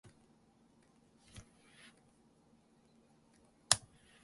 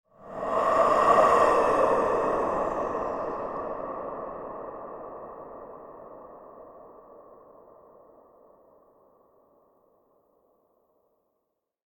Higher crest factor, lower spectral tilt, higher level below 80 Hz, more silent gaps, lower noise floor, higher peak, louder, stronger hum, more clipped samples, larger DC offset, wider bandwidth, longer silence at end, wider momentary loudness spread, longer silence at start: first, 44 dB vs 22 dB; second, 0 dB/octave vs -5 dB/octave; second, -72 dBFS vs -56 dBFS; neither; second, -69 dBFS vs -80 dBFS; first, -2 dBFS vs -8 dBFS; second, -33 LUFS vs -25 LUFS; neither; neither; neither; second, 11.5 kHz vs 13.5 kHz; second, 0.45 s vs 4.55 s; about the same, 28 LU vs 26 LU; first, 1.35 s vs 0.2 s